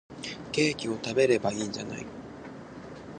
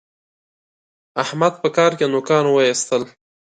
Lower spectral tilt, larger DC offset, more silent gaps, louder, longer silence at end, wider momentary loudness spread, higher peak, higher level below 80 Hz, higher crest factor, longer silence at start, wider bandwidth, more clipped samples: about the same, -4.5 dB/octave vs -4 dB/octave; neither; neither; second, -29 LUFS vs -18 LUFS; second, 0 s vs 0.45 s; first, 19 LU vs 9 LU; second, -10 dBFS vs -2 dBFS; first, -60 dBFS vs -68 dBFS; about the same, 20 dB vs 18 dB; second, 0.1 s vs 1.15 s; about the same, 10 kHz vs 9.4 kHz; neither